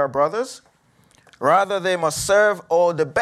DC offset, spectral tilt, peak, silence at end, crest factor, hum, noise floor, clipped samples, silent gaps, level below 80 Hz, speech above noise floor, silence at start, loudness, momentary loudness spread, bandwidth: under 0.1%; -3.5 dB/octave; -4 dBFS; 0 s; 16 dB; none; -58 dBFS; under 0.1%; none; -54 dBFS; 38 dB; 0 s; -19 LUFS; 7 LU; 14.5 kHz